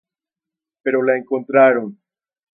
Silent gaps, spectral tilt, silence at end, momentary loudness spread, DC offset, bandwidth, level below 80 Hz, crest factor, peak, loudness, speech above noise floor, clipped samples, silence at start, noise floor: none; -11 dB/octave; 0.6 s; 12 LU; under 0.1%; 3.5 kHz; -78 dBFS; 18 dB; 0 dBFS; -17 LUFS; 71 dB; under 0.1%; 0.85 s; -87 dBFS